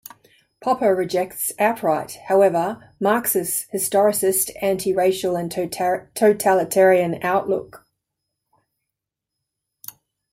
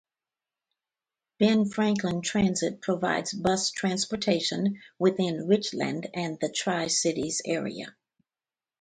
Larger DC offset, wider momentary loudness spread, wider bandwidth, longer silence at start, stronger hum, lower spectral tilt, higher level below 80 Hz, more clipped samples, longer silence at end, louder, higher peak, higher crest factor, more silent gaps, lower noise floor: neither; first, 10 LU vs 6 LU; first, 16 kHz vs 9.4 kHz; second, 0.6 s vs 1.4 s; neither; about the same, -4 dB/octave vs -4 dB/octave; about the same, -62 dBFS vs -62 dBFS; neither; first, 2.55 s vs 0.9 s; first, -20 LUFS vs -27 LUFS; first, -4 dBFS vs -10 dBFS; about the same, 18 dB vs 18 dB; neither; second, -83 dBFS vs under -90 dBFS